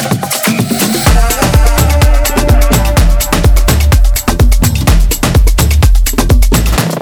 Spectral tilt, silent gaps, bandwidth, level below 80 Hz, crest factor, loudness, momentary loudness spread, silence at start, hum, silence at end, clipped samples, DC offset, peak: -4.5 dB/octave; none; over 20 kHz; -10 dBFS; 8 dB; -10 LUFS; 2 LU; 0 s; none; 0 s; under 0.1%; under 0.1%; 0 dBFS